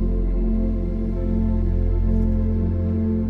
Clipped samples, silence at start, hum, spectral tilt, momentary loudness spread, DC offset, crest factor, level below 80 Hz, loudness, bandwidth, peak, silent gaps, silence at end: under 0.1%; 0 s; none; -12 dB/octave; 3 LU; under 0.1%; 10 dB; -22 dBFS; -23 LUFS; 2.4 kHz; -8 dBFS; none; 0 s